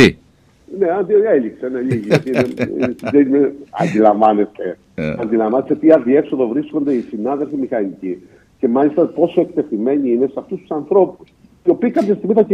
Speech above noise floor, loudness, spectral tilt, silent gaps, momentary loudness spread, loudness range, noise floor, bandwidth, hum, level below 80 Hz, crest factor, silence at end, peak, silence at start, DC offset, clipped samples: 36 dB; -16 LUFS; -7.5 dB/octave; none; 11 LU; 3 LU; -51 dBFS; 11 kHz; none; -52 dBFS; 16 dB; 0 s; 0 dBFS; 0 s; under 0.1%; under 0.1%